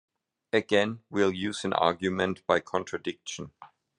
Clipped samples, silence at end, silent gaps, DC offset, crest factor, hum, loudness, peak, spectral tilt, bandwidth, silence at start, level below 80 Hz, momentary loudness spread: under 0.1%; 0.35 s; none; under 0.1%; 22 dB; none; -28 LUFS; -8 dBFS; -4.5 dB/octave; 11 kHz; 0.55 s; -70 dBFS; 12 LU